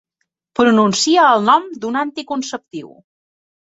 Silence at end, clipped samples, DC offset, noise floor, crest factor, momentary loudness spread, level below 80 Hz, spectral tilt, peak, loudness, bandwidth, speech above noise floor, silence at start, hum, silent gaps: 0.8 s; under 0.1%; under 0.1%; -73 dBFS; 16 dB; 16 LU; -62 dBFS; -3.5 dB/octave; -2 dBFS; -15 LUFS; 8.2 kHz; 58 dB; 0.6 s; none; none